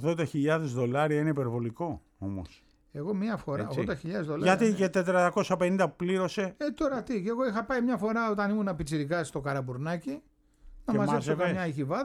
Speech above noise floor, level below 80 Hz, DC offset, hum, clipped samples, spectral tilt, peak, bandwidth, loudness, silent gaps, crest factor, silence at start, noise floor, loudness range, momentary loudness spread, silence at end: 24 dB; -56 dBFS; under 0.1%; none; under 0.1%; -6.5 dB/octave; -10 dBFS; 13 kHz; -30 LUFS; none; 20 dB; 0 s; -53 dBFS; 4 LU; 11 LU; 0 s